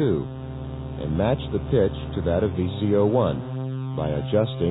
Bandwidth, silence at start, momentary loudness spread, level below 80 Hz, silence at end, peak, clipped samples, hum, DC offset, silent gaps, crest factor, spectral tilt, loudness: 4 kHz; 0 s; 12 LU; -40 dBFS; 0 s; -8 dBFS; under 0.1%; none; under 0.1%; none; 16 dB; -12 dB/octave; -25 LUFS